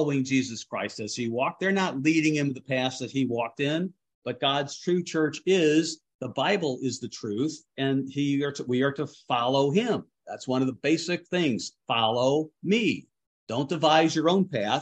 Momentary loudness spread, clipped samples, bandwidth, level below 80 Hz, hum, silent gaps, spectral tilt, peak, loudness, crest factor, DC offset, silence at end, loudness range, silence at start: 10 LU; under 0.1%; 9 kHz; -72 dBFS; none; 4.15-4.22 s, 6.15-6.19 s, 13.27-13.47 s; -5 dB/octave; -6 dBFS; -26 LUFS; 20 dB; under 0.1%; 0 s; 2 LU; 0 s